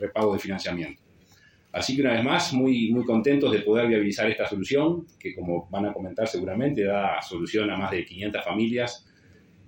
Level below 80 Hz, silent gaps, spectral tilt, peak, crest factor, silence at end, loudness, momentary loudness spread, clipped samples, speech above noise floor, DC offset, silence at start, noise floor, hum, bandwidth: -62 dBFS; none; -5.5 dB/octave; -8 dBFS; 18 dB; 0.7 s; -25 LUFS; 9 LU; under 0.1%; 32 dB; under 0.1%; 0 s; -57 dBFS; none; 16.5 kHz